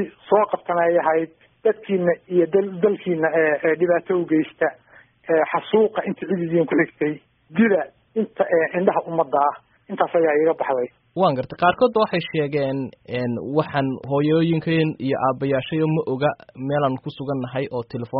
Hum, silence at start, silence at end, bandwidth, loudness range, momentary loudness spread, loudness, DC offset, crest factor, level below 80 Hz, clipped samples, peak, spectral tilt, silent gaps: none; 0 s; 0 s; 5.2 kHz; 2 LU; 8 LU; -21 LUFS; under 0.1%; 18 dB; -62 dBFS; under 0.1%; -2 dBFS; -5.5 dB/octave; none